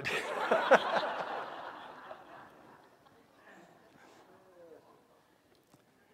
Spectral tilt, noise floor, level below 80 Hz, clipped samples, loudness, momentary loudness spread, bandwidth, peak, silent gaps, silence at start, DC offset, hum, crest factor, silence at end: -3.5 dB/octave; -67 dBFS; -80 dBFS; under 0.1%; -31 LUFS; 26 LU; 15.5 kHz; -6 dBFS; none; 0 s; under 0.1%; none; 32 dB; 1.4 s